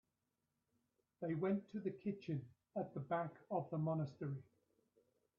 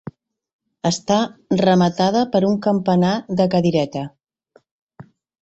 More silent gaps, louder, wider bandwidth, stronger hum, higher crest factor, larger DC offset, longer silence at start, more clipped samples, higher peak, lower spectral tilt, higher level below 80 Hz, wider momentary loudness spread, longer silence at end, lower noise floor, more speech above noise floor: second, none vs 0.53-0.59 s, 4.71-4.87 s; second, -44 LUFS vs -18 LUFS; second, 6.8 kHz vs 8 kHz; neither; about the same, 18 dB vs 16 dB; neither; first, 1.2 s vs 0.05 s; neither; second, -28 dBFS vs -2 dBFS; first, -8.5 dB/octave vs -6 dB/octave; second, -84 dBFS vs -56 dBFS; about the same, 7 LU vs 9 LU; first, 0.95 s vs 0.4 s; first, -88 dBFS vs -57 dBFS; first, 46 dB vs 40 dB